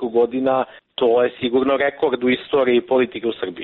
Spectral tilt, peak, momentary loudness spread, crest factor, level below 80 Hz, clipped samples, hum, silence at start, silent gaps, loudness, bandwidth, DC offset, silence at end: -3 dB/octave; -6 dBFS; 5 LU; 12 dB; -58 dBFS; under 0.1%; none; 0 s; none; -19 LUFS; 4.2 kHz; under 0.1%; 0 s